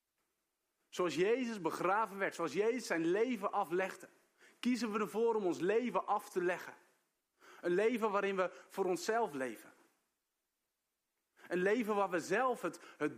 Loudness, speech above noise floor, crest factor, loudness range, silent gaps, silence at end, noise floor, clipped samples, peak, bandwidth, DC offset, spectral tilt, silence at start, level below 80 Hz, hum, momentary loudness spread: -36 LUFS; 53 dB; 18 dB; 4 LU; none; 0 s; -88 dBFS; under 0.1%; -20 dBFS; 15.5 kHz; under 0.1%; -5 dB/octave; 0.95 s; -88 dBFS; none; 8 LU